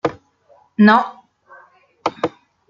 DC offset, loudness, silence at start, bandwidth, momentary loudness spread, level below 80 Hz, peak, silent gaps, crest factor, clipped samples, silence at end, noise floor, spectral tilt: under 0.1%; -17 LUFS; 0.05 s; 7.2 kHz; 16 LU; -64 dBFS; -2 dBFS; none; 18 dB; under 0.1%; 0.4 s; -54 dBFS; -7 dB/octave